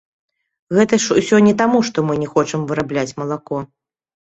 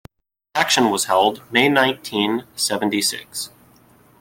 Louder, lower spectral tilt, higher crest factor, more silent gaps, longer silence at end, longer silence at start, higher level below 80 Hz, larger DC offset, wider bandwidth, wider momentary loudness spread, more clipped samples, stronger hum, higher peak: about the same, -17 LUFS vs -19 LUFS; first, -5 dB/octave vs -2.5 dB/octave; about the same, 16 dB vs 18 dB; neither; second, 0.6 s vs 0.75 s; first, 0.7 s vs 0.55 s; first, -56 dBFS vs -62 dBFS; neither; second, 8.2 kHz vs 17 kHz; about the same, 12 LU vs 12 LU; neither; neither; about the same, -2 dBFS vs -2 dBFS